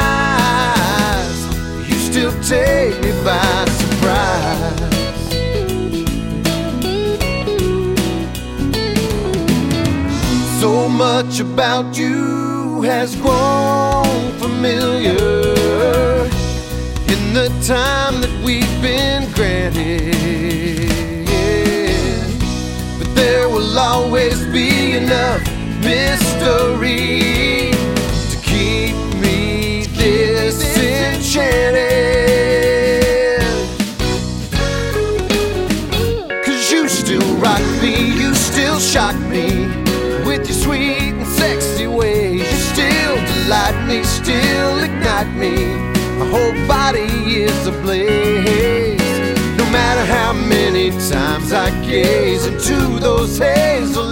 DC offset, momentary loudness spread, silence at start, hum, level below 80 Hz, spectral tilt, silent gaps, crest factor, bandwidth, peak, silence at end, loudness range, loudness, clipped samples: under 0.1%; 5 LU; 0 s; none; -26 dBFS; -4.5 dB/octave; none; 16 dB; 16.5 kHz; 0 dBFS; 0 s; 3 LU; -15 LUFS; under 0.1%